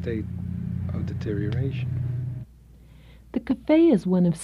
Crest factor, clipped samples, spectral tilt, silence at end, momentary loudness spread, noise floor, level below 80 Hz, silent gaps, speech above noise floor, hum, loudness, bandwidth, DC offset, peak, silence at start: 16 dB; under 0.1%; -8.5 dB/octave; 0 s; 14 LU; -50 dBFS; -46 dBFS; none; 27 dB; none; -25 LUFS; 11 kHz; under 0.1%; -8 dBFS; 0 s